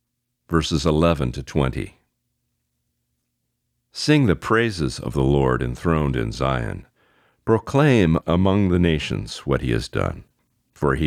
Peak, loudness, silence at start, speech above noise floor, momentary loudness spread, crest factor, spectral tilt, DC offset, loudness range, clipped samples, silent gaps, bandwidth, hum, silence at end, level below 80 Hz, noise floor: -4 dBFS; -21 LUFS; 0.5 s; 55 dB; 10 LU; 18 dB; -6.5 dB/octave; under 0.1%; 5 LU; under 0.1%; none; 14 kHz; none; 0 s; -36 dBFS; -75 dBFS